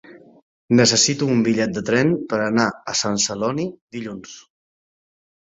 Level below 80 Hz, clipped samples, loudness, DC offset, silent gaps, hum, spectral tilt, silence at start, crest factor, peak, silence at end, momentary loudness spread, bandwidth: -58 dBFS; under 0.1%; -19 LUFS; under 0.1%; 0.42-0.68 s, 3.81-3.88 s; none; -3.5 dB/octave; 0.05 s; 18 dB; -2 dBFS; 1.15 s; 17 LU; 8 kHz